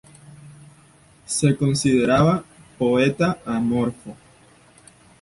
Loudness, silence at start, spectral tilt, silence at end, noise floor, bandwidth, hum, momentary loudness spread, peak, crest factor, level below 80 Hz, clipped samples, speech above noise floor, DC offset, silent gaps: -20 LUFS; 0.3 s; -5.5 dB/octave; 1.05 s; -52 dBFS; 11.5 kHz; none; 9 LU; -6 dBFS; 18 dB; -50 dBFS; under 0.1%; 33 dB; under 0.1%; none